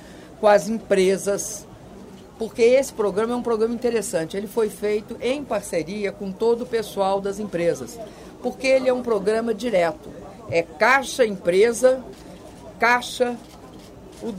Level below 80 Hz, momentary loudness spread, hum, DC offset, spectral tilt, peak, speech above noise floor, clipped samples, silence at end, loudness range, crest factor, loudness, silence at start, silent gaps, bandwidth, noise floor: -52 dBFS; 22 LU; none; under 0.1%; -4 dB/octave; -4 dBFS; 21 dB; under 0.1%; 0 s; 4 LU; 18 dB; -22 LUFS; 0 s; none; 16 kHz; -42 dBFS